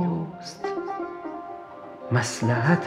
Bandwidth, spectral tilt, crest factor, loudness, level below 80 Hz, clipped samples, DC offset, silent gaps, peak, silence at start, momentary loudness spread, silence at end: 13 kHz; -6 dB/octave; 20 dB; -28 LUFS; -66 dBFS; under 0.1%; under 0.1%; none; -6 dBFS; 0 s; 16 LU; 0 s